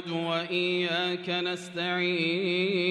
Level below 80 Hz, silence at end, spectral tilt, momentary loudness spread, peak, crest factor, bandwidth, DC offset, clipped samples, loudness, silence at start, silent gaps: -78 dBFS; 0 s; -5 dB/octave; 4 LU; -14 dBFS; 14 dB; 10.5 kHz; under 0.1%; under 0.1%; -28 LUFS; 0 s; none